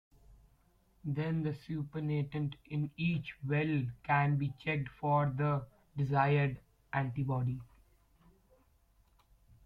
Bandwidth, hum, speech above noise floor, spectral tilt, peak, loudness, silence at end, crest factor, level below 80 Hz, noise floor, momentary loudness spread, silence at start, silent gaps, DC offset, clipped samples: 5 kHz; none; 35 dB; -9.5 dB/octave; -18 dBFS; -35 LUFS; 2 s; 18 dB; -64 dBFS; -69 dBFS; 9 LU; 0.3 s; none; under 0.1%; under 0.1%